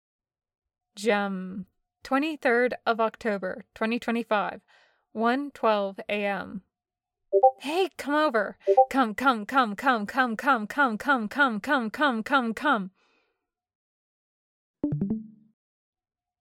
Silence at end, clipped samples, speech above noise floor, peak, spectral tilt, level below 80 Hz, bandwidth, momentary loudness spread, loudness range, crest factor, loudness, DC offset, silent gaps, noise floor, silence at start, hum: 1.1 s; under 0.1%; 64 dB; -8 dBFS; -5.5 dB/octave; -66 dBFS; 16.5 kHz; 9 LU; 6 LU; 20 dB; -26 LUFS; under 0.1%; 13.75-14.74 s; -90 dBFS; 0.95 s; none